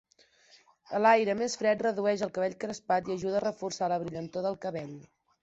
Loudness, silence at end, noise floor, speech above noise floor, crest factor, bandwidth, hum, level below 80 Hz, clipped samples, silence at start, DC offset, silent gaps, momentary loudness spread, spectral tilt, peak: -30 LUFS; 0.4 s; -62 dBFS; 33 dB; 22 dB; 8.2 kHz; none; -70 dBFS; under 0.1%; 0.9 s; under 0.1%; none; 13 LU; -4.5 dB/octave; -10 dBFS